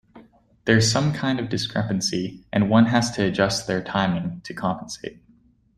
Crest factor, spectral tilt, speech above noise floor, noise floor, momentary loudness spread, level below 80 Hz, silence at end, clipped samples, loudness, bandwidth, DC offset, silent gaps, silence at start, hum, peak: 20 dB; -5 dB/octave; 36 dB; -58 dBFS; 13 LU; -52 dBFS; 0.65 s; under 0.1%; -22 LUFS; 13 kHz; under 0.1%; none; 0.15 s; none; -2 dBFS